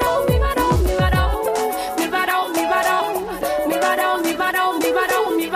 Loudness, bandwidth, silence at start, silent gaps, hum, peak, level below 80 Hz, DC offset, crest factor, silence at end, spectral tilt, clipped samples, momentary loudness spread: -19 LUFS; 15.5 kHz; 0 s; none; none; -6 dBFS; -28 dBFS; under 0.1%; 14 dB; 0 s; -5 dB/octave; under 0.1%; 4 LU